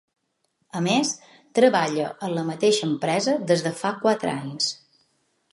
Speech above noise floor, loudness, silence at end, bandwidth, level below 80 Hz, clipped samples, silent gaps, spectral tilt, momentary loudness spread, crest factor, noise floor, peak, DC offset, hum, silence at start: 50 dB; -23 LUFS; 0.8 s; 11.5 kHz; -74 dBFS; under 0.1%; none; -4 dB/octave; 9 LU; 20 dB; -72 dBFS; -4 dBFS; under 0.1%; none; 0.75 s